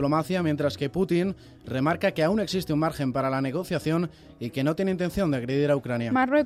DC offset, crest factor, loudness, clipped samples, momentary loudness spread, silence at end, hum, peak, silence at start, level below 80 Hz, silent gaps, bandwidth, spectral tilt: under 0.1%; 16 dB; -26 LUFS; under 0.1%; 4 LU; 0 s; none; -10 dBFS; 0 s; -52 dBFS; none; 15.5 kHz; -7 dB/octave